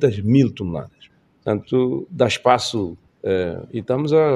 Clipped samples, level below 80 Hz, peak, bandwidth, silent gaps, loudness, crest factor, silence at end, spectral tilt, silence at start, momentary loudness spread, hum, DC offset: under 0.1%; -52 dBFS; 0 dBFS; 11.5 kHz; none; -20 LUFS; 20 dB; 0 s; -6.5 dB/octave; 0 s; 13 LU; none; under 0.1%